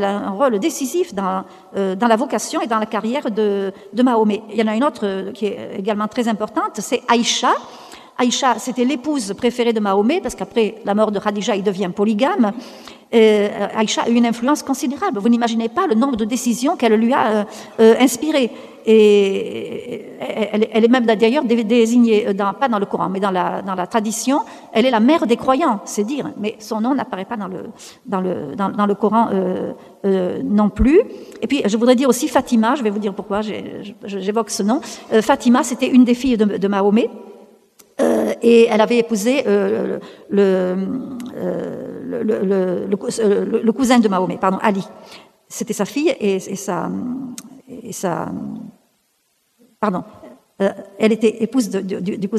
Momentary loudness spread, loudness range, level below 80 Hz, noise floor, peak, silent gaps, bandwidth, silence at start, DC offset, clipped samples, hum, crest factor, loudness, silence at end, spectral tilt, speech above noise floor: 12 LU; 6 LU; -46 dBFS; -64 dBFS; 0 dBFS; none; 14.5 kHz; 0 s; under 0.1%; under 0.1%; none; 18 dB; -18 LUFS; 0 s; -5 dB/octave; 47 dB